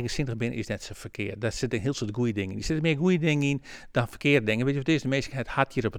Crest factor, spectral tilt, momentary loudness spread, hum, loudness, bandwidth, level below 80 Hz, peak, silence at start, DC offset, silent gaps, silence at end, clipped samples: 20 dB; -6 dB/octave; 10 LU; none; -27 LUFS; 15.5 kHz; -48 dBFS; -6 dBFS; 0 s; under 0.1%; none; 0 s; under 0.1%